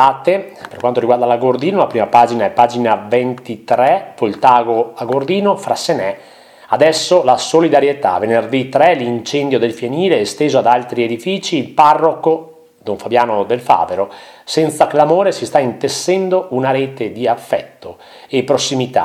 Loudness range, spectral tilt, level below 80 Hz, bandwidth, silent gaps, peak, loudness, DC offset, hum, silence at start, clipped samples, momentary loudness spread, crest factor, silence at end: 2 LU; -4.5 dB/octave; -60 dBFS; 15.5 kHz; none; 0 dBFS; -14 LUFS; under 0.1%; none; 0 s; 0.1%; 9 LU; 14 dB; 0 s